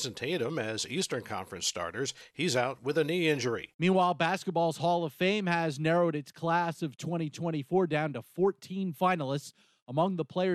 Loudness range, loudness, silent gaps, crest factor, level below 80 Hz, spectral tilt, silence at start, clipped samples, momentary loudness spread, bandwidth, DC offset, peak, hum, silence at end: 3 LU; -31 LUFS; 3.74-3.79 s, 9.82-9.86 s; 18 dB; -72 dBFS; -5 dB/octave; 0 s; under 0.1%; 8 LU; 13.5 kHz; under 0.1%; -14 dBFS; none; 0 s